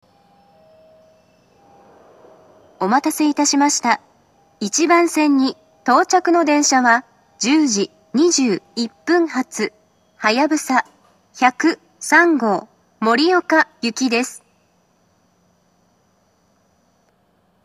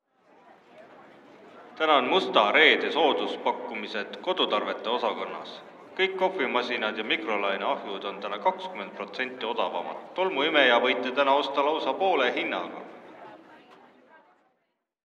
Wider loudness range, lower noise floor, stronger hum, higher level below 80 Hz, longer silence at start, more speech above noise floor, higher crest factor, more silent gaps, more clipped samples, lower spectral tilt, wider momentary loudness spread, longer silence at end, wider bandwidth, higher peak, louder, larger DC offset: about the same, 7 LU vs 6 LU; second, -61 dBFS vs -77 dBFS; neither; first, -74 dBFS vs -88 dBFS; first, 2.8 s vs 0.75 s; second, 44 dB vs 51 dB; about the same, 20 dB vs 22 dB; neither; neither; second, -2.5 dB/octave vs -4 dB/octave; second, 10 LU vs 15 LU; first, 3.3 s vs 1.35 s; first, 13.5 kHz vs 8.4 kHz; first, 0 dBFS vs -4 dBFS; first, -17 LUFS vs -26 LUFS; neither